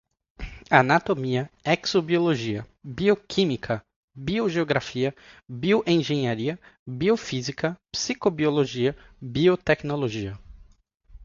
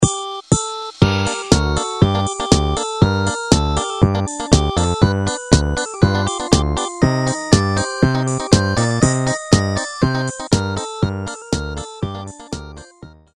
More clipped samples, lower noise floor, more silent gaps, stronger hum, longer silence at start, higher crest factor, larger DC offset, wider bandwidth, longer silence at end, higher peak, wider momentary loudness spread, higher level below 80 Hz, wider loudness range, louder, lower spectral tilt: neither; first, -49 dBFS vs -42 dBFS; first, 3.96-4.08 s, 6.79-6.86 s vs none; neither; first, 0.4 s vs 0 s; first, 24 dB vs 18 dB; second, under 0.1% vs 0.1%; second, 7.6 kHz vs 11.5 kHz; second, 0 s vs 0.25 s; about the same, 0 dBFS vs 0 dBFS; first, 14 LU vs 10 LU; second, -52 dBFS vs -28 dBFS; about the same, 2 LU vs 4 LU; second, -24 LUFS vs -18 LUFS; about the same, -5.5 dB/octave vs -5 dB/octave